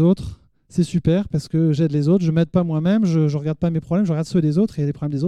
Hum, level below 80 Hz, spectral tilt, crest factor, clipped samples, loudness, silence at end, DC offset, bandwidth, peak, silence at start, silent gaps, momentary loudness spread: none; -46 dBFS; -8.5 dB/octave; 12 dB; under 0.1%; -20 LUFS; 0 s; under 0.1%; 9.8 kHz; -6 dBFS; 0 s; none; 6 LU